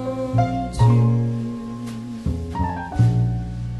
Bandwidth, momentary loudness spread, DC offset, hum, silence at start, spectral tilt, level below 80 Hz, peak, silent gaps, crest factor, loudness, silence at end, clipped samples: 11 kHz; 13 LU; under 0.1%; none; 0 s; -8.5 dB/octave; -34 dBFS; -4 dBFS; none; 16 dB; -22 LUFS; 0 s; under 0.1%